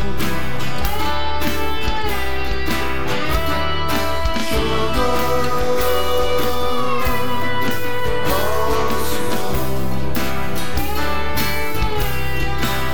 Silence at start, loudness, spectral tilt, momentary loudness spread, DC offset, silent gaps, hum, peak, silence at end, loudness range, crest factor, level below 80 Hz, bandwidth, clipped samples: 0 s; -21 LUFS; -4.5 dB/octave; 4 LU; 20%; none; none; -6 dBFS; 0 s; 3 LU; 16 dB; -28 dBFS; over 20 kHz; under 0.1%